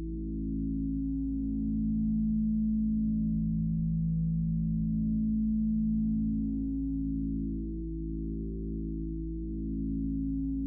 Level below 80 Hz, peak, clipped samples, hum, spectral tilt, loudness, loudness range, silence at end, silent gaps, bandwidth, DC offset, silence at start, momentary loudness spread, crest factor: -38 dBFS; -22 dBFS; under 0.1%; none; -20.5 dB/octave; -32 LUFS; 5 LU; 0 s; none; 0.8 kHz; under 0.1%; 0 s; 7 LU; 8 dB